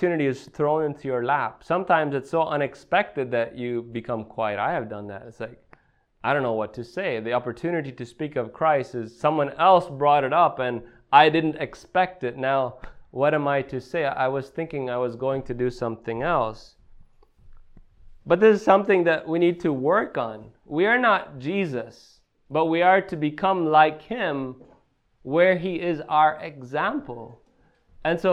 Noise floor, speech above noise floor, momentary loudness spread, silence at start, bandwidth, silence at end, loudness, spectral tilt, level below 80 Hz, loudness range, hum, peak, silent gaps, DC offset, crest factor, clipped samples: -62 dBFS; 39 dB; 13 LU; 0 s; 9.8 kHz; 0 s; -23 LUFS; -7 dB/octave; -54 dBFS; 8 LU; none; -2 dBFS; none; under 0.1%; 22 dB; under 0.1%